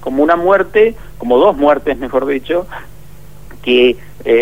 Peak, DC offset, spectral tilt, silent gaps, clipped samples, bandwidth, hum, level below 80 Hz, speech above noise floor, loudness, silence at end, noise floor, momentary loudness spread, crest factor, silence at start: 0 dBFS; 2%; -6 dB/octave; none; under 0.1%; 16 kHz; 50 Hz at -40 dBFS; -40 dBFS; 26 dB; -13 LUFS; 0 s; -38 dBFS; 13 LU; 14 dB; 0 s